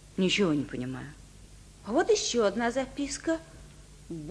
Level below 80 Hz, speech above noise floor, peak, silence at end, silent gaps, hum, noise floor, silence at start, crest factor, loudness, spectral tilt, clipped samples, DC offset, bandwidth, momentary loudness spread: -54 dBFS; 23 dB; -14 dBFS; 0 s; none; 50 Hz at -55 dBFS; -51 dBFS; 0 s; 16 dB; -29 LUFS; -4 dB/octave; under 0.1%; under 0.1%; 11 kHz; 18 LU